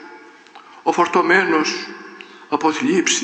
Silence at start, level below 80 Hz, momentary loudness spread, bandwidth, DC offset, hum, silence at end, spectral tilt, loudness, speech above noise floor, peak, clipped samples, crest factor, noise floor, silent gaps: 0 s; -72 dBFS; 20 LU; 9 kHz; under 0.1%; none; 0 s; -2.5 dB/octave; -18 LUFS; 26 dB; -2 dBFS; under 0.1%; 18 dB; -43 dBFS; none